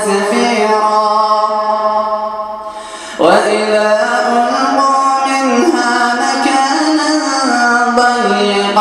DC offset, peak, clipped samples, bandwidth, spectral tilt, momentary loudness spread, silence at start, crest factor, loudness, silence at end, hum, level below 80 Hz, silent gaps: under 0.1%; 0 dBFS; under 0.1%; 13 kHz; -3 dB/octave; 6 LU; 0 s; 12 dB; -12 LUFS; 0 s; none; -56 dBFS; none